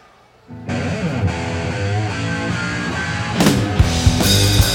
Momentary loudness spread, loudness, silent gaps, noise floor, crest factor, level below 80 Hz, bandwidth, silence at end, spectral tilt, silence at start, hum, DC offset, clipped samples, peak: 9 LU; -18 LUFS; none; -48 dBFS; 18 dB; -28 dBFS; 16.5 kHz; 0 s; -4.5 dB/octave; 0.5 s; none; under 0.1%; under 0.1%; 0 dBFS